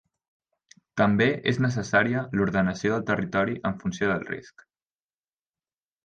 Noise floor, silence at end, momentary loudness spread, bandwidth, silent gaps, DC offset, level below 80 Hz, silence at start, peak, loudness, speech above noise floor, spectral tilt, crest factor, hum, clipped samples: under -90 dBFS; 1.55 s; 8 LU; 8.8 kHz; none; under 0.1%; -56 dBFS; 0.95 s; -8 dBFS; -25 LUFS; over 65 dB; -6.5 dB/octave; 20 dB; none; under 0.1%